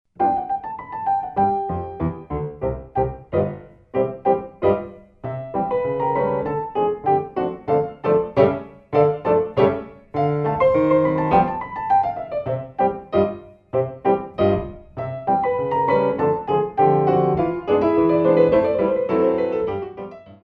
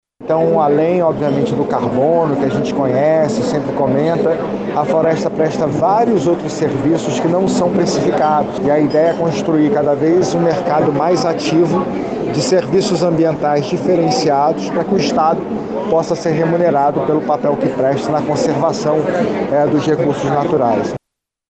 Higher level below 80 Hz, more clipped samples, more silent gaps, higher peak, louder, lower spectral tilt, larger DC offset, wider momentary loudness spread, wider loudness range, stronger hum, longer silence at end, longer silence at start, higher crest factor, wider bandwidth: about the same, -46 dBFS vs -48 dBFS; neither; neither; about the same, -2 dBFS vs -2 dBFS; second, -21 LUFS vs -15 LUFS; first, -10 dB/octave vs -6.5 dB/octave; neither; first, 11 LU vs 4 LU; first, 6 LU vs 1 LU; neither; second, 0.1 s vs 0.55 s; about the same, 0.2 s vs 0.2 s; first, 18 dB vs 12 dB; second, 5.4 kHz vs 9 kHz